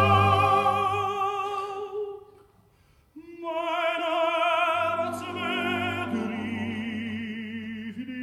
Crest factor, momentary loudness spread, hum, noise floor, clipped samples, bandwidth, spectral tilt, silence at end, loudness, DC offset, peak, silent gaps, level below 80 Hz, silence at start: 20 dB; 14 LU; none; -61 dBFS; under 0.1%; 13.5 kHz; -6 dB/octave; 0 s; -27 LUFS; under 0.1%; -8 dBFS; none; -64 dBFS; 0 s